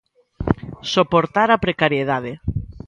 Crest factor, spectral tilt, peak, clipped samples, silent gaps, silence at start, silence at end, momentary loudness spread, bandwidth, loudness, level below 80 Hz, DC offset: 20 dB; -6 dB/octave; 0 dBFS; under 0.1%; none; 0.4 s; 0.1 s; 11 LU; 10.5 kHz; -19 LUFS; -38 dBFS; under 0.1%